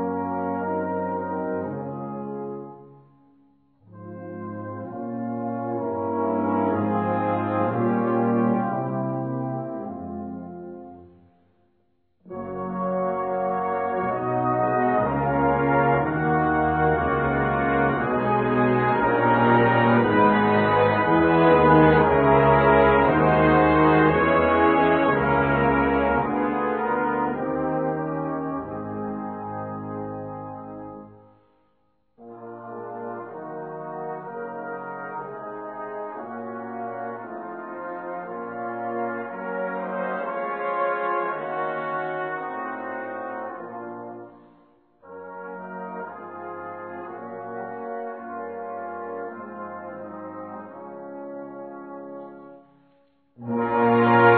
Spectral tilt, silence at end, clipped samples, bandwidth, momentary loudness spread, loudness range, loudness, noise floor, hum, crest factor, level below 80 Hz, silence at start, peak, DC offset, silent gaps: -11 dB/octave; 0 s; under 0.1%; 4.5 kHz; 19 LU; 19 LU; -23 LUFS; -69 dBFS; none; 20 dB; -46 dBFS; 0 s; -4 dBFS; under 0.1%; none